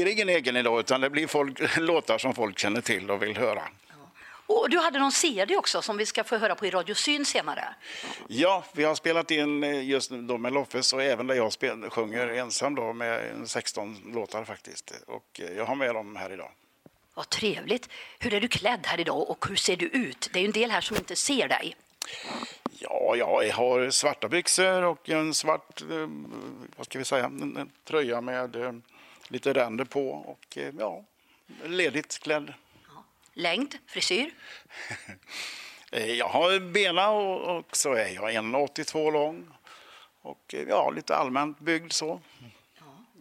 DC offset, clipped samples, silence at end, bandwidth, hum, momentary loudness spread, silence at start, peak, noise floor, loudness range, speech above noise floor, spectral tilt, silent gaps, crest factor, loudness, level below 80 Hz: under 0.1%; under 0.1%; 0.2 s; 16 kHz; none; 15 LU; 0 s; -8 dBFS; -60 dBFS; 7 LU; 32 dB; -2.5 dB/octave; none; 22 dB; -27 LUFS; -68 dBFS